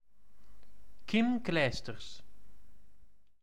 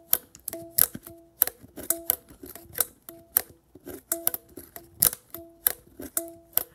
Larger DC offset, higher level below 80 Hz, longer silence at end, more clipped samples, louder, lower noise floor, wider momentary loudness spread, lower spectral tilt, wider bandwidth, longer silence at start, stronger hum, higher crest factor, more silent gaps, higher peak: first, 1% vs under 0.1%; about the same, -60 dBFS vs -60 dBFS; about the same, 0 s vs 0.1 s; neither; second, -32 LUFS vs -27 LUFS; first, -61 dBFS vs -49 dBFS; about the same, 21 LU vs 21 LU; first, -5.5 dB/octave vs -1 dB/octave; second, 11 kHz vs 18 kHz; about the same, 0 s vs 0.1 s; neither; second, 22 dB vs 30 dB; neither; second, -16 dBFS vs 0 dBFS